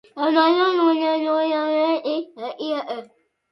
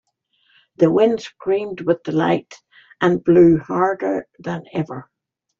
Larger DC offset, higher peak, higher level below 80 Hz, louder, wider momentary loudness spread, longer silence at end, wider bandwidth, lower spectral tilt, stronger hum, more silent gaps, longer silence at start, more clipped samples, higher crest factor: neither; about the same, -4 dBFS vs -2 dBFS; second, -76 dBFS vs -56 dBFS; about the same, -20 LUFS vs -18 LUFS; about the same, 13 LU vs 14 LU; second, 0.45 s vs 0.6 s; second, 6 kHz vs 7.2 kHz; second, -4.5 dB/octave vs -8 dB/octave; neither; neither; second, 0.15 s vs 0.8 s; neither; about the same, 18 dB vs 16 dB